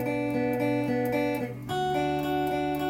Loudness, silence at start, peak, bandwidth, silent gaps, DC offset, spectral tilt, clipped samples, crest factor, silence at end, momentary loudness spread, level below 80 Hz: -28 LUFS; 0 s; -16 dBFS; 16.5 kHz; none; under 0.1%; -6.5 dB/octave; under 0.1%; 12 dB; 0 s; 3 LU; -54 dBFS